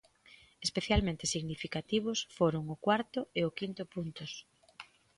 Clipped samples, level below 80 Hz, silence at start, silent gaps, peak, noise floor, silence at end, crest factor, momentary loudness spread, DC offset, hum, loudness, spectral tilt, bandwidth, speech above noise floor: under 0.1%; -50 dBFS; 0.6 s; none; -16 dBFS; -61 dBFS; 0.35 s; 20 dB; 14 LU; under 0.1%; none; -34 LUFS; -4.5 dB/octave; 11.5 kHz; 27 dB